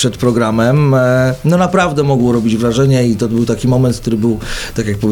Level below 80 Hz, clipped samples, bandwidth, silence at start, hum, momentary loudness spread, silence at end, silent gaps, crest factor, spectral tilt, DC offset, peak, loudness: -34 dBFS; under 0.1%; 18 kHz; 0 s; none; 6 LU; 0 s; none; 12 dB; -6.5 dB/octave; under 0.1%; 0 dBFS; -13 LUFS